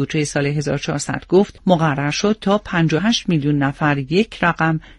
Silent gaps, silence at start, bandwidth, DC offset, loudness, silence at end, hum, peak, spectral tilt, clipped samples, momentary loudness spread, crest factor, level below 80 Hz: none; 0 s; 11.5 kHz; under 0.1%; -18 LUFS; 0.2 s; none; 0 dBFS; -5.5 dB/octave; under 0.1%; 4 LU; 18 dB; -46 dBFS